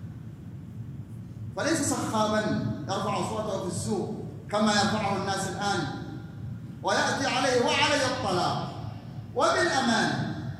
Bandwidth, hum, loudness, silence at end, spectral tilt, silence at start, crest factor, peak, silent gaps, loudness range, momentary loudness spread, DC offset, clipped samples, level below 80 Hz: 15.5 kHz; none; -27 LUFS; 0 s; -4 dB/octave; 0 s; 18 dB; -12 dBFS; none; 4 LU; 17 LU; under 0.1%; under 0.1%; -56 dBFS